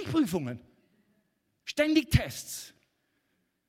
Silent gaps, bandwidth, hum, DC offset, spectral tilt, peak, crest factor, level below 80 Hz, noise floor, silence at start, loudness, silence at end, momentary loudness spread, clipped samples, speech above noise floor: none; 16.5 kHz; none; under 0.1%; -5.5 dB/octave; -8 dBFS; 24 dB; -46 dBFS; -77 dBFS; 0 s; -29 LUFS; 1 s; 19 LU; under 0.1%; 48 dB